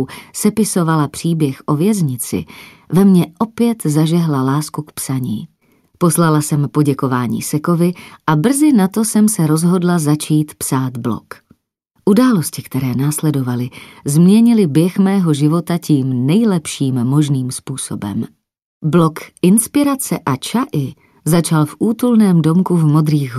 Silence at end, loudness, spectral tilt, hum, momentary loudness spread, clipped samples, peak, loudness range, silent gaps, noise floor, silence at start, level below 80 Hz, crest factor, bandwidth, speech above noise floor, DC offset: 0 s; -15 LUFS; -6.5 dB/octave; none; 11 LU; under 0.1%; 0 dBFS; 3 LU; 18.64-18.81 s; -63 dBFS; 0 s; -56 dBFS; 14 dB; 15 kHz; 48 dB; under 0.1%